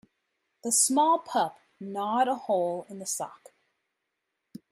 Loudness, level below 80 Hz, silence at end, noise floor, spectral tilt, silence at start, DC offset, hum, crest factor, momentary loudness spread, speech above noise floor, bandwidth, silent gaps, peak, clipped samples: -27 LUFS; -84 dBFS; 1.35 s; -82 dBFS; -2.5 dB/octave; 0.65 s; under 0.1%; none; 22 dB; 16 LU; 55 dB; 15.5 kHz; none; -8 dBFS; under 0.1%